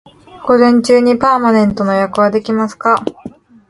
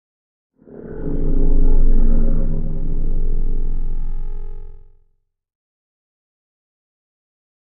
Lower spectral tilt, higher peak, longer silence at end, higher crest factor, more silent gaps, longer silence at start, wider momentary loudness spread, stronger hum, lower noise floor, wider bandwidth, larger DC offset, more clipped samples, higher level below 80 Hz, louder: second, -6 dB/octave vs -12.5 dB/octave; about the same, 0 dBFS vs -2 dBFS; second, 0.4 s vs 2.8 s; about the same, 12 dB vs 12 dB; neither; second, 0.35 s vs 0.8 s; second, 7 LU vs 18 LU; neither; second, -34 dBFS vs -63 dBFS; first, 11.5 kHz vs 1.4 kHz; neither; neither; second, -48 dBFS vs -16 dBFS; first, -12 LUFS vs -24 LUFS